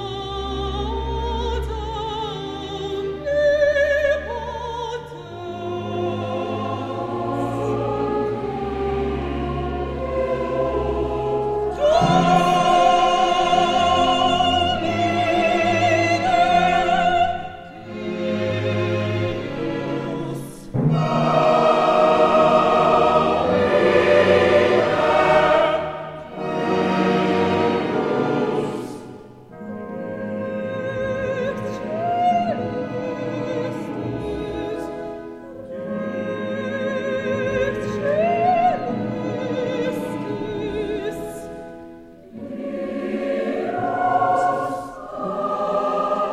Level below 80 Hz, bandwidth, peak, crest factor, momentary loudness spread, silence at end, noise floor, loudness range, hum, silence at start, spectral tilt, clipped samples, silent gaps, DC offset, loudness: -40 dBFS; 13 kHz; -4 dBFS; 18 dB; 14 LU; 0 s; -41 dBFS; 11 LU; none; 0 s; -6 dB/octave; under 0.1%; none; under 0.1%; -21 LUFS